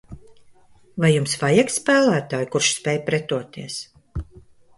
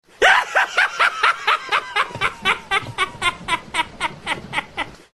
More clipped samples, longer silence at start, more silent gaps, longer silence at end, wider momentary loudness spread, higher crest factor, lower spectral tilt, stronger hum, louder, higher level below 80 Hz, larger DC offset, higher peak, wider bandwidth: neither; about the same, 0.1 s vs 0.2 s; neither; first, 0.4 s vs 0.2 s; first, 17 LU vs 10 LU; about the same, 18 dB vs 20 dB; first, -4.5 dB/octave vs -1.5 dB/octave; neither; about the same, -20 LUFS vs -19 LUFS; about the same, -46 dBFS vs -50 dBFS; neither; about the same, -4 dBFS vs -2 dBFS; second, 11.5 kHz vs 13 kHz